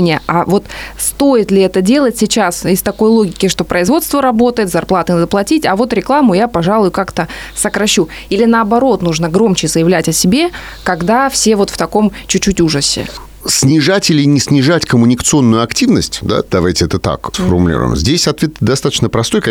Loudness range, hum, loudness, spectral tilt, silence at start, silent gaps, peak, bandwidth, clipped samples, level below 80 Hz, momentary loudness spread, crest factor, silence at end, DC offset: 2 LU; none; -12 LUFS; -4.5 dB/octave; 0 s; none; 0 dBFS; 20 kHz; under 0.1%; -34 dBFS; 6 LU; 10 dB; 0 s; under 0.1%